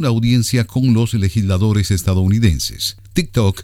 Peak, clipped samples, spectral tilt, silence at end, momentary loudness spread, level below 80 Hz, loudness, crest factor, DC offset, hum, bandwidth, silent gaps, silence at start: 0 dBFS; under 0.1%; -6 dB/octave; 0 s; 5 LU; -32 dBFS; -16 LUFS; 14 dB; under 0.1%; none; 16 kHz; none; 0 s